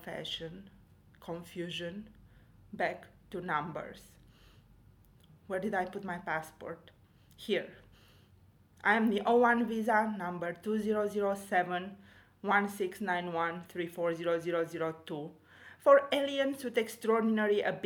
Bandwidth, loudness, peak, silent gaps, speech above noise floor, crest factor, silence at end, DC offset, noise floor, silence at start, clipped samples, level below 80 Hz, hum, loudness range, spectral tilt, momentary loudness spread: 19 kHz; -32 LUFS; -10 dBFS; none; 30 dB; 24 dB; 0 s; under 0.1%; -62 dBFS; 0 s; under 0.1%; -70 dBFS; none; 10 LU; -5.5 dB/octave; 18 LU